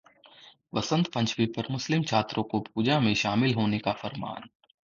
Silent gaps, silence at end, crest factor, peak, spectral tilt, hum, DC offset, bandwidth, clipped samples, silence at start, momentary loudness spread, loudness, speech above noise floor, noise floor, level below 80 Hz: none; 0.4 s; 20 dB; -10 dBFS; -5.5 dB/octave; none; under 0.1%; 7.4 kHz; under 0.1%; 0.45 s; 10 LU; -27 LUFS; 27 dB; -55 dBFS; -60 dBFS